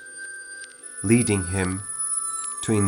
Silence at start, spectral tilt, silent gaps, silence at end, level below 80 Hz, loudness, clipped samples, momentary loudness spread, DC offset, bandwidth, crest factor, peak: 0 s; -4.5 dB/octave; none; 0 s; -58 dBFS; -24 LUFS; under 0.1%; 16 LU; under 0.1%; 17 kHz; 20 dB; -6 dBFS